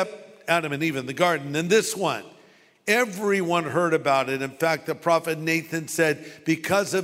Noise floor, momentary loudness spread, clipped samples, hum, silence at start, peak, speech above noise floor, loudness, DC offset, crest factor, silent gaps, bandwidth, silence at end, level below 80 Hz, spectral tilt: -55 dBFS; 6 LU; under 0.1%; none; 0 s; -4 dBFS; 32 dB; -24 LUFS; under 0.1%; 20 dB; none; 16 kHz; 0 s; -68 dBFS; -4 dB/octave